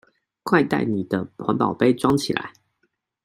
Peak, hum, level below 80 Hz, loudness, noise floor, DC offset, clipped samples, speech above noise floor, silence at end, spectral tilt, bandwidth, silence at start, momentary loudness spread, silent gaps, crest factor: -2 dBFS; none; -56 dBFS; -22 LUFS; -71 dBFS; under 0.1%; under 0.1%; 50 dB; 0.75 s; -6 dB/octave; 15.5 kHz; 0.45 s; 9 LU; none; 20 dB